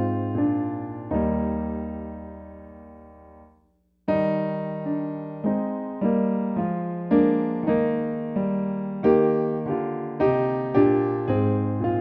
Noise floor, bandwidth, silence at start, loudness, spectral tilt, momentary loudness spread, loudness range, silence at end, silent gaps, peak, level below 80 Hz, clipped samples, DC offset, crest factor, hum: -65 dBFS; 5.2 kHz; 0 s; -24 LUFS; -11.5 dB/octave; 12 LU; 8 LU; 0 s; none; -8 dBFS; -48 dBFS; under 0.1%; under 0.1%; 18 dB; none